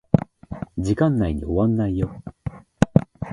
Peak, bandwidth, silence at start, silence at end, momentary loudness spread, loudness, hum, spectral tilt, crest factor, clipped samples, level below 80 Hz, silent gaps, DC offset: 0 dBFS; 11.5 kHz; 0.15 s; 0 s; 16 LU; -22 LUFS; none; -8.5 dB/octave; 22 dB; under 0.1%; -38 dBFS; none; under 0.1%